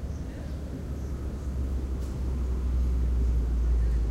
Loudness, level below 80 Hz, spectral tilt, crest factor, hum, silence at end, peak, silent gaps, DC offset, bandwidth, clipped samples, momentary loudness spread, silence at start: -31 LUFS; -28 dBFS; -8 dB/octave; 10 dB; none; 0 s; -18 dBFS; none; under 0.1%; 8 kHz; under 0.1%; 9 LU; 0 s